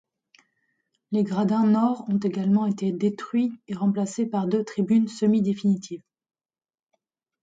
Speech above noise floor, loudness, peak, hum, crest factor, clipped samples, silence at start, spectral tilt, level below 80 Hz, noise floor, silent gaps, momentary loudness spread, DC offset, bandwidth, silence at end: over 67 dB; -24 LUFS; -12 dBFS; none; 14 dB; under 0.1%; 1.1 s; -7.5 dB/octave; -72 dBFS; under -90 dBFS; none; 6 LU; under 0.1%; 8 kHz; 1.45 s